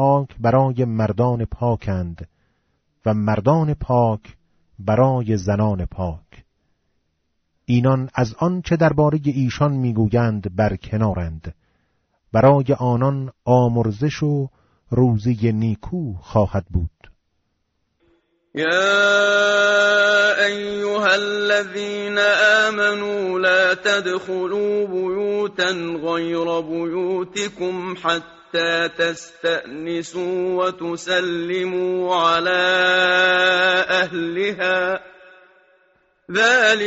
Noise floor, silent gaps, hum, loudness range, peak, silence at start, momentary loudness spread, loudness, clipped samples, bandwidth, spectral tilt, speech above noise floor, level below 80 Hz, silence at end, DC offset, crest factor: -71 dBFS; none; none; 6 LU; -2 dBFS; 0 s; 11 LU; -19 LUFS; under 0.1%; 8 kHz; -4 dB/octave; 52 dB; -44 dBFS; 0 s; under 0.1%; 16 dB